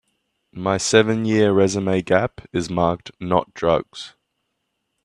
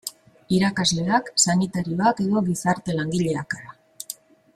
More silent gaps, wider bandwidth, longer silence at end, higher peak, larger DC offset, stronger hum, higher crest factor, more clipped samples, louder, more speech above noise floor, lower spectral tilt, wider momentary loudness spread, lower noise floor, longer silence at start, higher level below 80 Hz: neither; second, 11 kHz vs 15.5 kHz; first, 0.95 s vs 0.4 s; first, 0 dBFS vs -4 dBFS; neither; neither; about the same, 20 dB vs 20 dB; neither; about the same, -20 LUFS vs -22 LUFS; first, 55 dB vs 20 dB; about the same, -5 dB/octave vs -4 dB/octave; second, 12 LU vs 16 LU; first, -75 dBFS vs -41 dBFS; first, 0.55 s vs 0.05 s; about the same, -52 dBFS vs -56 dBFS